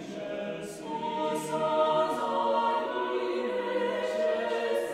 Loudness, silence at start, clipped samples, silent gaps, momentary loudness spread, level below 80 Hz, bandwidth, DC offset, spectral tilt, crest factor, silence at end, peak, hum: -30 LUFS; 0 s; under 0.1%; none; 9 LU; -70 dBFS; 15.5 kHz; under 0.1%; -4.5 dB/octave; 14 dB; 0 s; -14 dBFS; none